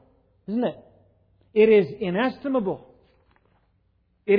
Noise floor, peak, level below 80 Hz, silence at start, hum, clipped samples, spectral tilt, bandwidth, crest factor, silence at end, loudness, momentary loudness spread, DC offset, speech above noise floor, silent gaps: -67 dBFS; -8 dBFS; -64 dBFS; 0.5 s; none; under 0.1%; -9.5 dB/octave; 5 kHz; 18 dB; 0 s; -23 LUFS; 18 LU; under 0.1%; 45 dB; none